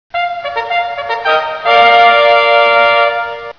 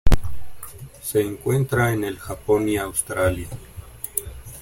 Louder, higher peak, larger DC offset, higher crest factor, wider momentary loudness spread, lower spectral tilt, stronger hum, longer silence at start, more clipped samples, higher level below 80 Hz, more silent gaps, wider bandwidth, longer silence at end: first, -10 LUFS vs -24 LUFS; about the same, 0 dBFS vs -2 dBFS; first, 0.2% vs under 0.1%; second, 10 dB vs 18 dB; second, 11 LU vs 18 LU; second, -2.5 dB/octave vs -5.5 dB/octave; neither; about the same, 0.15 s vs 0.05 s; first, 0.3% vs under 0.1%; second, -54 dBFS vs -30 dBFS; neither; second, 5.4 kHz vs 16.5 kHz; about the same, 0.05 s vs 0 s